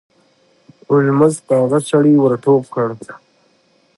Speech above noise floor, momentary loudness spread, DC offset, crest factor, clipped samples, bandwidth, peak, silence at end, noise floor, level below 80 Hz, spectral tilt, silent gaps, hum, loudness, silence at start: 43 dB; 10 LU; under 0.1%; 16 dB; under 0.1%; 11.5 kHz; 0 dBFS; 0.8 s; -57 dBFS; -64 dBFS; -7.5 dB/octave; none; none; -14 LUFS; 0.9 s